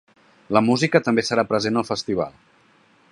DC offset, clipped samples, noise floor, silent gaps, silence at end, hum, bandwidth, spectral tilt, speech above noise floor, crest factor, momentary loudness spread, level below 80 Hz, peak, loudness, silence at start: under 0.1%; under 0.1%; -57 dBFS; none; 0.8 s; none; 11.5 kHz; -5 dB/octave; 37 dB; 22 dB; 8 LU; -60 dBFS; 0 dBFS; -21 LUFS; 0.5 s